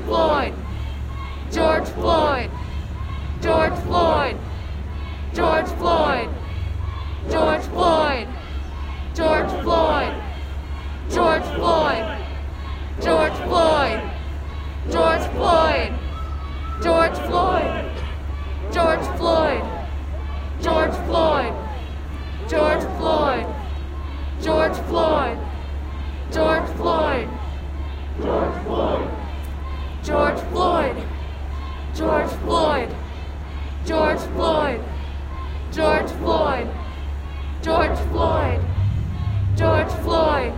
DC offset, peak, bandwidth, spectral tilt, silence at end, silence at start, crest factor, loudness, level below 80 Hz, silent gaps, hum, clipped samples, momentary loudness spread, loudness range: under 0.1%; -4 dBFS; 15.5 kHz; -6.5 dB/octave; 0 s; 0 s; 18 dB; -22 LUFS; -28 dBFS; none; none; under 0.1%; 12 LU; 3 LU